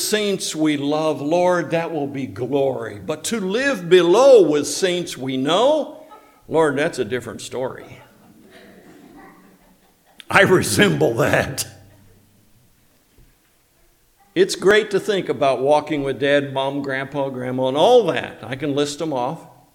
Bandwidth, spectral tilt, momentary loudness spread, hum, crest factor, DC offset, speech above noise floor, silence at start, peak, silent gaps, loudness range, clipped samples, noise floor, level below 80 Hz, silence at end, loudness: 17 kHz; -4.5 dB/octave; 13 LU; none; 20 dB; under 0.1%; 40 dB; 0 s; 0 dBFS; none; 9 LU; under 0.1%; -59 dBFS; -56 dBFS; 0.3 s; -19 LUFS